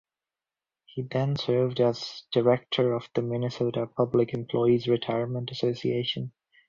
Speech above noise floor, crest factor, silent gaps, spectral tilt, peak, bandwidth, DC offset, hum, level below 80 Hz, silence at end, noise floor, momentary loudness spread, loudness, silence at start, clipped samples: over 64 dB; 18 dB; none; -7.5 dB/octave; -10 dBFS; 7.4 kHz; under 0.1%; none; -64 dBFS; 0.4 s; under -90 dBFS; 8 LU; -27 LUFS; 0.95 s; under 0.1%